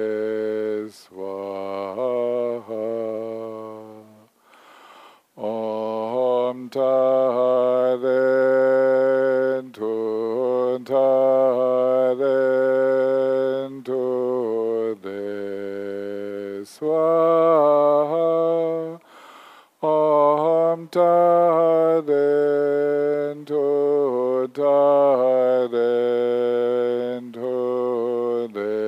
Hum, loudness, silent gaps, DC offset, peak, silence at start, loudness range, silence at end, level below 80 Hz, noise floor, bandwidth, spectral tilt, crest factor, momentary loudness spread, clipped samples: none; -21 LUFS; none; under 0.1%; -6 dBFS; 0 s; 9 LU; 0 s; -86 dBFS; -53 dBFS; 8 kHz; -7.5 dB/octave; 14 dB; 13 LU; under 0.1%